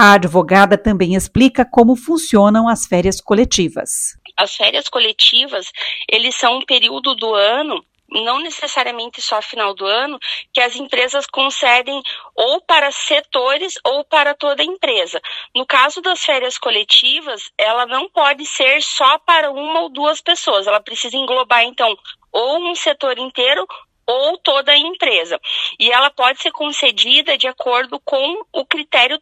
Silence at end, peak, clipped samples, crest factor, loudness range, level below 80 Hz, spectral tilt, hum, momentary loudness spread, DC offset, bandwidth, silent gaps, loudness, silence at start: 0.05 s; 0 dBFS; under 0.1%; 16 dB; 3 LU; -44 dBFS; -3 dB/octave; none; 9 LU; under 0.1%; 16 kHz; none; -14 LUFS; 0 s